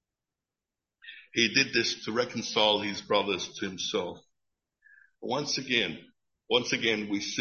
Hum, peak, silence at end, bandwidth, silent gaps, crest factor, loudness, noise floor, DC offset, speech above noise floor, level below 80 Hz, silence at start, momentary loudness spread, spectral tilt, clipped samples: none; -8 dBFS; 0 s; 7.2 kHz; none; 22 dB; -28 LUFS; -90 dBFS; under 0.1%; 61 dB; -68 dBFS; 1.05 s; 11 LU; -2.5 dB/octave; under 0.1%